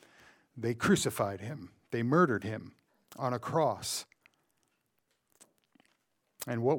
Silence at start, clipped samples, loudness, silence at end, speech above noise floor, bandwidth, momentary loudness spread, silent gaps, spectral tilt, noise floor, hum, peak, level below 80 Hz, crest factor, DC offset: 0.55 s; under 0.1%; -32 LUFS; 0 s; 47 dB; 19 kHz; 16 LU; none; -5 dB/octave; -79 dBFS; none; -14 dBFS; -68 dBFS; 20 dB; under 0.1%